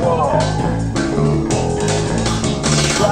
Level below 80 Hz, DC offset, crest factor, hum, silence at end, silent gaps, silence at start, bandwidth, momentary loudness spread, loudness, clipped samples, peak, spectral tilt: -30 dBFS; under 0.1%; 14 dB; none; 0 s; none; 0 s; 14.5 kHz; 4 LU; -17 LUFS; under 0.1%; -2 dBFS; -5 dB/octave